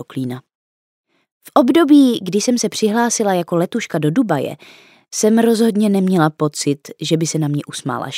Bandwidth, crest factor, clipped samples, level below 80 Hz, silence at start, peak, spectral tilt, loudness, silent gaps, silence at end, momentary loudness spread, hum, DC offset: 16 kHz; 16 dB; under 0.1%; -70 dBFS; 0 s; 0 dBFS; -5 dB/octave; -16 LUFS; 0.55-1.04 s, 1.31-1.41 s; 0 s; 12 LU; none; under 0.1%